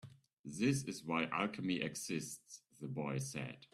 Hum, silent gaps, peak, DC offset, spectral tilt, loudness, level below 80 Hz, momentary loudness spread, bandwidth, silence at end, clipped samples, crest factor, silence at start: none; 0.33-0.44 s; -20 dBFS; under 0.1%; -4.5 dB/octave; -40 LUFS; -76 dBFS; 14 LU; 14 kHz; 0.1 s; under 0.1%; 20 dB; 0.05 s